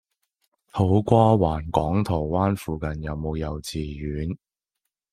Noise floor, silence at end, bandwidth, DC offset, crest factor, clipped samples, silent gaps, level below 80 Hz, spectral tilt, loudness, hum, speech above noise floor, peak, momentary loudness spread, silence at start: -83 dBFS; 0.75 s; 15.5 kHz; under 0.1%; 22 dB; under 0.1%; none; -42 dBFS; -8 dB/octave; -24 LUFS; none; 60 dB; -2 dBFS; 13 LU; 0.75 s